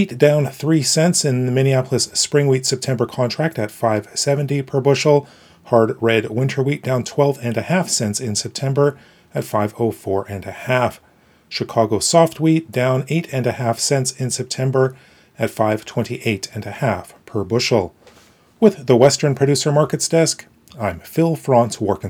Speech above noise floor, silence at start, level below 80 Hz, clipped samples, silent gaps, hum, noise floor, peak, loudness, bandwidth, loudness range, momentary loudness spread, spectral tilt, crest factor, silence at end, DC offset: 33 dB; 0 s; -58 dBFS; under 0.1%; none; none; -51 dBFS; 0 dBFS; -18 LUFS; 19.5 kHz; 5 LU; 9 LU; -5 dB/octave; 18 dB; 0 s; under 0.1%